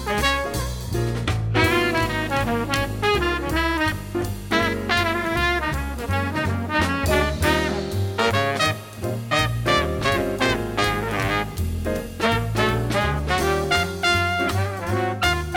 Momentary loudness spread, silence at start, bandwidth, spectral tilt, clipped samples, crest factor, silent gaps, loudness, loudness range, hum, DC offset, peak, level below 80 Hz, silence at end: 6 LU; 0 s; 17.5 kHz; -5 dB/octave; under 0.1%; 18 dB; none; -22 LUFS; 1 LU; none; under 0.1%; -4 dBFS; -34 dBFS; 0 s